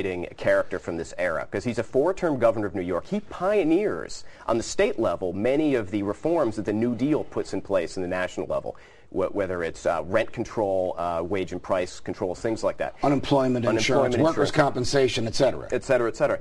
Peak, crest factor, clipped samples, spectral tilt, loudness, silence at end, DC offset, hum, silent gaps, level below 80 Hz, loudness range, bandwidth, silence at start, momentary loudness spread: -4 dBFS; 20 dB; under 0.1%; -5.5 dB/octave; -25 LUFS; 0 s; 0.3%; none; none; -48 dBFS; 5 LU; 12 kHz; 0 s; 8 LU